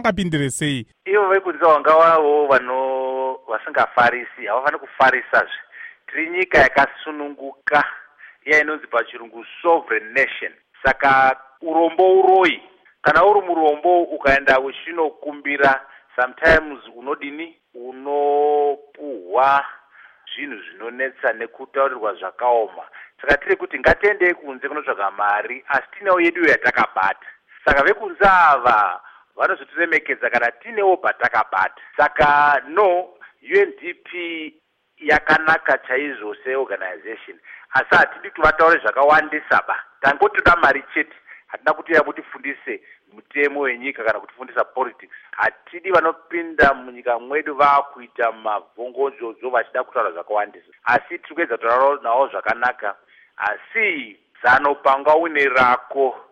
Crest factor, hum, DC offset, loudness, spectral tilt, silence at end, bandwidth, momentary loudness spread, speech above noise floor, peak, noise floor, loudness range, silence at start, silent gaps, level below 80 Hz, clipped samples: 18 dB; none; under 0.1%; -18 LUFS; -5 dB/octave; 0.1 s; 12.5 kHz; 15 LU; 29 dB; -2 dBFS; -48 dBFS; 6 LU; 0 s; none; -46 dBFS; under 0.1%